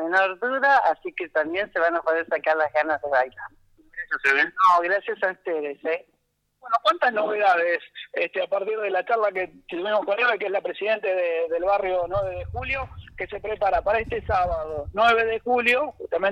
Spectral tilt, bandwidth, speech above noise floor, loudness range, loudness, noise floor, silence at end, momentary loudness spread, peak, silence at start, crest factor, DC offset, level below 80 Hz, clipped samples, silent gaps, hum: -5 dB/octave; 11 kHz; 48 dB; 3 LU; -23 LUFS; -71 dBFS; 0 s; 11 LU; -8 dBFS; 0 s; 16 dB; under 0.1%; -48 dBFS; under 0.1%; none; 50 Hz at -75 dBFS